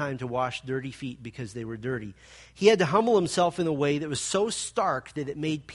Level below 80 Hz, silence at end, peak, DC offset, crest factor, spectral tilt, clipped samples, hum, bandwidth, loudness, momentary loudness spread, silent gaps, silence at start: -60 dBFS; 0 s; -6 dBFS; under 0.1%; 22 dB; -4.5 dB/octave; under 0.1%; none; 11.5 kHz; -27 LUFS; 15 LU; none; 0 s